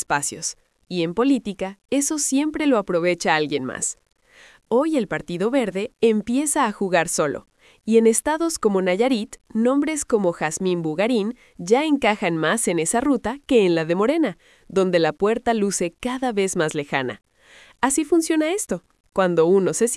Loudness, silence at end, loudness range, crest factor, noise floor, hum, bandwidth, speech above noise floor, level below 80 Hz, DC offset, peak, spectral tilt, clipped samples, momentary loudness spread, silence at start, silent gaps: -21 LUFS; 0 s; 2 LU; 20 dB; -51 dBFS; none; 12 kHz; 30 dB; -56 dBFS; under 0.1%; -2 dBFS; -4 dB/octave; under 0.1%; 8 LU; 0 s; 19.00-19.04 s